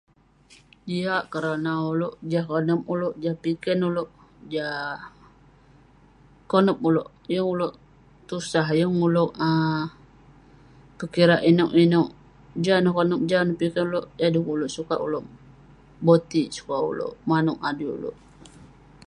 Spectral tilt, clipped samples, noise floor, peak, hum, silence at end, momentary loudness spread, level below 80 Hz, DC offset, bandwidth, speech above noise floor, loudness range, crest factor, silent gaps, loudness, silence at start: -6.5 dB/octave; under 0.1%; -56 dBFS; -4 dBFS; none; 0.45 s; 12 LU; -58 dBFS; under 0.1%; 11 kHz; 33 dB; 6 LU; 20 dB; none; -24 LUFS; 0.85 s